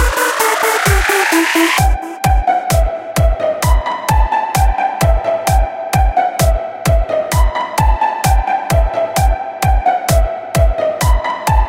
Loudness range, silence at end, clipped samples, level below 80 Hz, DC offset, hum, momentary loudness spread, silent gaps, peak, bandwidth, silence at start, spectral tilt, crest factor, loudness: 2 LU; 0 s; under 0.1%; -16 dBFS; under 0.1%; none; 4 LU; none; 0 dBFS; 17 kHz; 0 s; -4.5 dB/octave; 12 dB; -14 LUFS